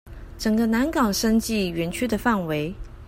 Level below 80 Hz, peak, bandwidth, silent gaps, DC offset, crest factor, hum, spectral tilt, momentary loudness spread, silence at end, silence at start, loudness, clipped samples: -40 dBFS; -6 dBFS; 16 kHz; none; under 0.1%; 16 dB; none; -5 dB/octave; 7 LU; 0 s; 0.05 s; -23 LUFS; under 0.1%